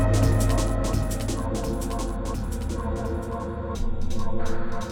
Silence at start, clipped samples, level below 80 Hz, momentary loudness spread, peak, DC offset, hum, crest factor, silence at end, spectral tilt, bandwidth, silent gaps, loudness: 0 s; under 0.1%; -28 dBFS; 9 LU; -10 dBFS; under 0.1%; none; 14 dB; 0 s; -6 dB/octave; 16.5 kHz; none; -28 LUFS